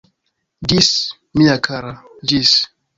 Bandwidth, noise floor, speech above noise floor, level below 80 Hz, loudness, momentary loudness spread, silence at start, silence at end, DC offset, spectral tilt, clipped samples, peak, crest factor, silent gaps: 7.8 kHz; -71 dBFS; 55 dB; -44 dBFS; -15 LUFS; 12 LU; 0.6 s; 0.3 s; under 0.1%; -3.5 dB/octave; under 0.1%; 0 dBFS; 18 dB; none